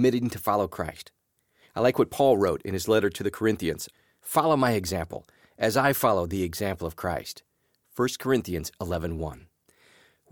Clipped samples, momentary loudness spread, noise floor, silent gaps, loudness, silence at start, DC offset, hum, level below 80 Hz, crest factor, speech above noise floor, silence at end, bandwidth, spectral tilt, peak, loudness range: under 0.1%; 15 LU; -65 dBFS; none; -26 LUFS; 0 s; under 0.1%; none; -50 dBFS; 20 dB; 39 dB; 0.95 s; 19.5 kHz; -5.5 dB/octave; -8 dBFS; 6 LU